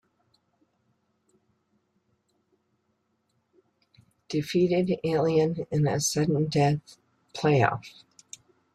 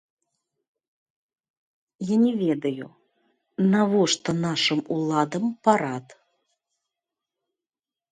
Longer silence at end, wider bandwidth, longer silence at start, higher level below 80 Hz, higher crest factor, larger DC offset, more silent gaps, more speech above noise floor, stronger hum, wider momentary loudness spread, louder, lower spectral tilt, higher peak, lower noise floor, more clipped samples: second, 0.85 s vs 2 s; first, 13.5 kHz vs 9.6 kHz; first, 4.3 s vs 2 s; first, -64 dBFS vs -70 dBFS; about the same, 22 dB vs 22 dB; neither; neither; second, 49 dB vs over 67 dB; neither; first, 23 LU vs 15 LU; second, -26 LUFS vs -23 LUFS; about the same, -5.5 dB/octave vs -5 dB/octave; second, -8 dBFS vs -4 dBFS; second, -74 dBFS vs under -90 dBFS; neither